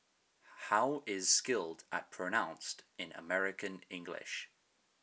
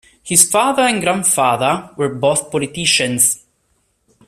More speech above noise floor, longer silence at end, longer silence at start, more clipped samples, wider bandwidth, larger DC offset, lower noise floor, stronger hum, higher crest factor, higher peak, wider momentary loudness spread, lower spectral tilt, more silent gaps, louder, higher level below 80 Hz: second, 38 dB vs 48 dB; second, 0.55 s vs 0.9 s; first, 0.45 s vs 0.25 s; neither; second, 8 kHz vs 16 kHz; neither; first, -76 dBFS vs -63 dBFS; neither; first, 24 dB vs 16 dB; second, -16 dBFS vs 0 dBFS; first, 16 LU vs 8 LU; about the same, -1 dB/octave vs -2 dB/octave; neither; second, -36 LUFS vs -14 LUFS; second, -86 dBFS vs -54 dBFS